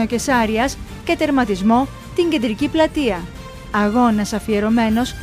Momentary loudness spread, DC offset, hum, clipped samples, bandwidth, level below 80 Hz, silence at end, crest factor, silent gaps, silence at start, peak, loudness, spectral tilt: 7 LU; under 0.1%; none; under 0.1%; 15.5 kHz; -36 dBFS; 0 s; 14 dB; none; 0 s; -4 dBFS; -18 LUFS; -5 dB/octave